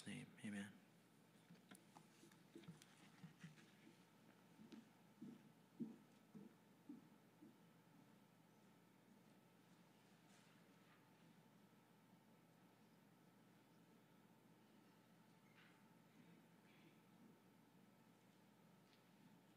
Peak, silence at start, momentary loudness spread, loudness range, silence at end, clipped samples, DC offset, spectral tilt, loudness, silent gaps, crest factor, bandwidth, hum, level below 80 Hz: -40 dBFS; 0 s; 14 LU; 7 LU; 0 s; under 0.1%; under 0.1%; -5 dB/octave; -62 LUFS; none; 26 dB; 15.5 kHz; none; under -90 dBFS